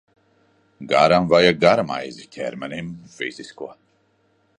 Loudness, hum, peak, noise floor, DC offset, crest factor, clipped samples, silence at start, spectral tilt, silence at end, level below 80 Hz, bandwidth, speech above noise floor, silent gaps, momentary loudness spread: -19 LUFS; none; -2 dBFS; -63 dBFS; under 0.1%; 20 dB; under 0.1%; 0.8 s; -5.5 dB/octave; 0.9 s; -56 dBFS; 9.8 kHz; 43 dB; none; 21 LU